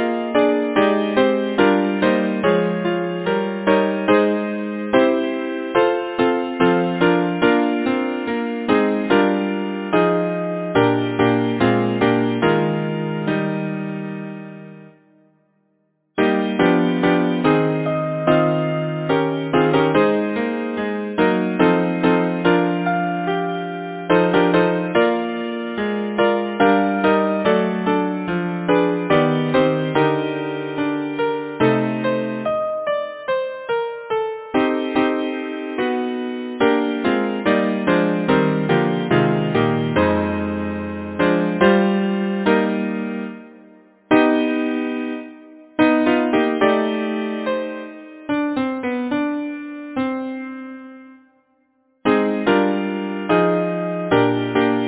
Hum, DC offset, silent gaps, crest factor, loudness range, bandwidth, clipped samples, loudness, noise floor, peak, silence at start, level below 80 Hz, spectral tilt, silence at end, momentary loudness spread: none; under 0.1%; none; 18 dB; 5 LU; 4 kHz; under 0.1%; -19 LUFS; -66 dBFS; 0 dBFS; 0 s; -50 dBFS; -10.5 dB/octave; 0 s; 8 LU